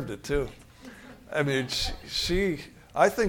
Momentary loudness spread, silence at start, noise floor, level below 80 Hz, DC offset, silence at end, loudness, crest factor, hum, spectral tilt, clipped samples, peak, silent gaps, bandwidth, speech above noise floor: 22 LU; 0 s; -47 dBFS; -42 dBFS; under 0.1%; 0 s; -29 LUFS; 22 dB; none; -4 dB/octave; under 0.1%; -6 dBFS; none; 18.5 kHz; 20 dB